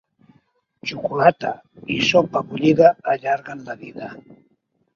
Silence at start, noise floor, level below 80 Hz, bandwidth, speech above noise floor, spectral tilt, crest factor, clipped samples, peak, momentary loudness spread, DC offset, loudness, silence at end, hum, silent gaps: 0.85 s; -66 dBFS; -60 dBFS; 7.2 kHz; 47 dB; -5.5 dB/octave; 20 dB; under 0.1%; 0 dBFS; 19 LU; under 0.1%; -19 LUFS; 0.75 s; none; none